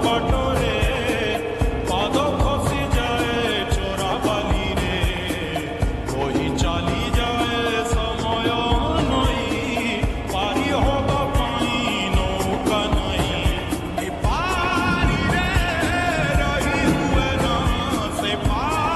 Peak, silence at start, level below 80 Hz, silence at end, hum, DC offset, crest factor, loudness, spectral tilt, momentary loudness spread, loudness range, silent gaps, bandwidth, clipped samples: -6 dBFS; 0 s; -28 dBFS; 0 s; none; 0.1%; 14 dB; -21 LUFS; -5 dB/octave; 4 LU; 2 LU; none; 13 kHz; under 0.1%